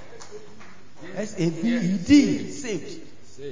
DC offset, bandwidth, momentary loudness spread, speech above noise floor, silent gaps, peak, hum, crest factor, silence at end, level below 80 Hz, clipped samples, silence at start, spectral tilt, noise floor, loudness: 2%; 7.6 kHz; 25 LU; 26 dB; none; -4 dBFS; none; 20 dB; 0 s; -52 dBFS; under 0.1%; 0 s; -5.5 dB/octave; -49 dBFS; -23 LUFS